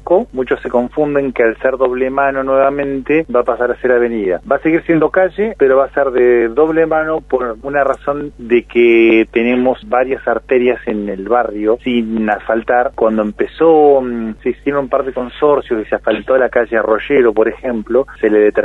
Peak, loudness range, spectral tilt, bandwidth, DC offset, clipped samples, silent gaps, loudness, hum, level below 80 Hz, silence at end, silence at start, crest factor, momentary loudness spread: 0 dBFS; 2 LU; -8 dB/octave; 4.1 kHz; under 0.1%; under 0.1%; none; -14 LUFS; none; -40 dBFS; 0 s; 0.05 s; 12 dB; 7 LU